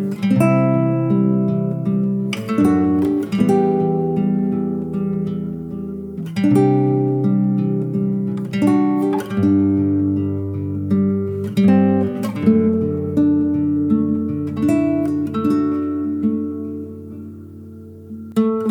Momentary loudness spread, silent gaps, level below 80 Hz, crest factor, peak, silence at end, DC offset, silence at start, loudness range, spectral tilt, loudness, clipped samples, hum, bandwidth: 12 LU; none; -54 dBFS; 16 dB; -2 dBFS; 0 s; under 0.1%; 0 s; 3 LU; -9 dB/octave; -18 LUFS; under 0.1%; none; 14 kHz